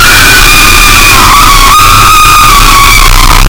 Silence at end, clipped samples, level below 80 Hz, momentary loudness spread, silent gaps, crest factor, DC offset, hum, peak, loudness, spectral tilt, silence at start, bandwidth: 0 s; 40%; -8 dBFS; 1 LU; none; 2 dB; under 0.1%; none; 0 dBFS; 0 LUFS; -1.5 dB/octave; 0 s; over 20 kHz